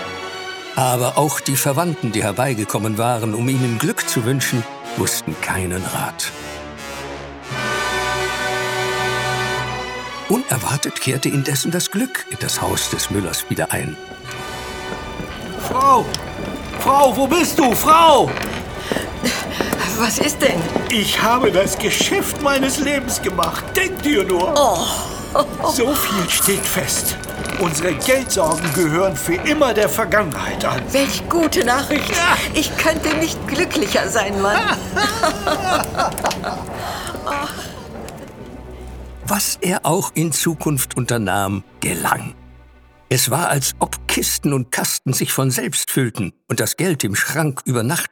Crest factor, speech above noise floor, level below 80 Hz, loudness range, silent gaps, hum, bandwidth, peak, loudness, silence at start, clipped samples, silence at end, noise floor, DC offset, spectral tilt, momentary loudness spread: 18 dB; 29 dB; -40 dBFS; 6 LU; none; none; over 20 kHz; 0 dBFS; -18 LUFS; 0 s; under 0.1%; 0.05 s; -47 dBFS; under 0.1%; -3.5 dB/octave; 12 LU